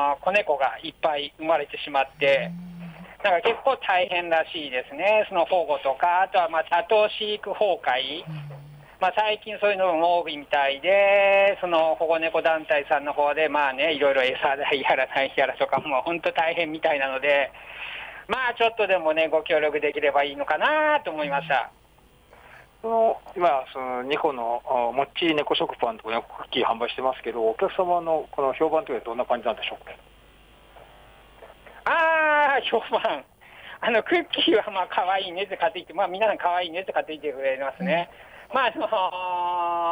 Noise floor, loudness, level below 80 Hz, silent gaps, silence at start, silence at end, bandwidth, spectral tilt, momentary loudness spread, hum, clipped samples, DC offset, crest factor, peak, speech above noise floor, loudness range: -56 dBFS; -24 LUFS; -60 dBFS; none; 0 s; 0 s; 11 kHz; -5 dB/octave; 8 LU; none; under 0.1%; under 0.1%; 14 dB; -10 dBFS; 32 dB; 5 LU